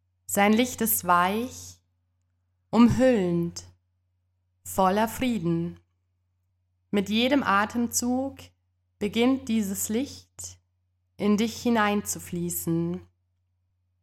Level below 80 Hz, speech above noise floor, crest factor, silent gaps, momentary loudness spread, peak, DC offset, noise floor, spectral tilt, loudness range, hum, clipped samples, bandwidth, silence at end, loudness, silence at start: -56 dBFS; 49 dB; 20 dB; none; 15 LU; -8 dBFS; under 0.1%; -73 dBFS; -4.5 dB/octave; 5 LU; none; under 0.1%; 17 kHz; 1 s; -25 LUFS; 0.3 s